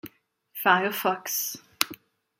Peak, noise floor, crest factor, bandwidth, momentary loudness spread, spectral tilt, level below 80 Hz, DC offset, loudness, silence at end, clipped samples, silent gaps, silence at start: 0 dBFS; -55 dBFS; 28 dB; 16.5 kHz; 14 LU; -2 dB/octave; -76 dBFS; under 0.1%; -26 LUFS; 0.45 s; under 0.1%; none; 0.05 s